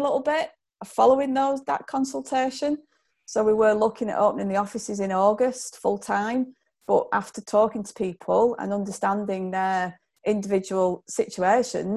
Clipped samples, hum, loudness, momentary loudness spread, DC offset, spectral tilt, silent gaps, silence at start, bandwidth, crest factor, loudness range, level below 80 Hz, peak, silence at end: under 0.1%; none; -24 LUFS; 10 LU; under 0.1%; -5 dB/octave; none; 0 s; 12.5 kHz; 18 dB; 2 LU; -64 dBFS; -6 dBFS; 0 s